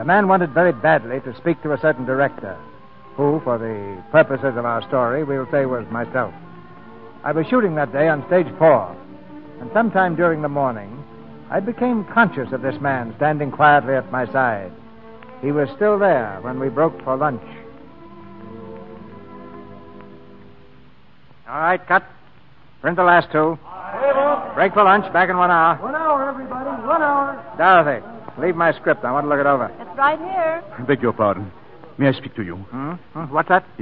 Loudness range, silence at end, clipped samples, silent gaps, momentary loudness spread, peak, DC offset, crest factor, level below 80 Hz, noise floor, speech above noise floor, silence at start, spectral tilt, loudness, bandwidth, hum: 8 LU; 0 s; under 0.1%; none; 21 LU; 0 dBFS; 0.6%; 18 dB; -58 dBFS; -51 dBFS; 33 dB; 0 s; -10.5 dB/octave; -19 LUFS; 5 kHz; none